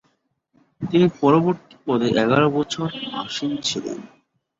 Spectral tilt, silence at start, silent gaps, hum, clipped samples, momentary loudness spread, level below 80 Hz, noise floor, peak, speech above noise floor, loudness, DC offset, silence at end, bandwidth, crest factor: -5.5 dB/octave; 0.8 s; none; none; under 0.1%; 12 LU; -58 dBFS; -68 dBFS; -4 dBFS; 47 dB; -21 LUFS; under 0.1%; 0.55 s; 8 kHz; 18 dB